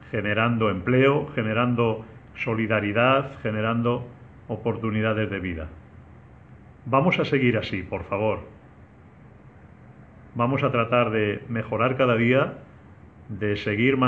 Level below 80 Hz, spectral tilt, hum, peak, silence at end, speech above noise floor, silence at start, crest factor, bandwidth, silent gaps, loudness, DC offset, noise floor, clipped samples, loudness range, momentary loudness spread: -52 dBFS; -8.5 dB/octave; none; -4 dBFS; 0 s; 26 dB; 0 s; 20 dB; 6.6 kHz; none; -24 LUFS; under 0.1%; -49 dBFS; under 0.1%; 5 LU; 12 LU